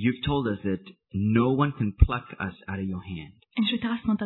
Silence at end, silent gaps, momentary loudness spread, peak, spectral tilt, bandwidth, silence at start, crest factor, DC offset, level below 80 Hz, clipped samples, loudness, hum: 0 s; none; 12 LU; -2 dBFS; -10.5 dB/octave; 4.2 kHz; 0 s; 24 dB; under 0.1%; -34 dBFS; under 0.1%; -27 LUFS; none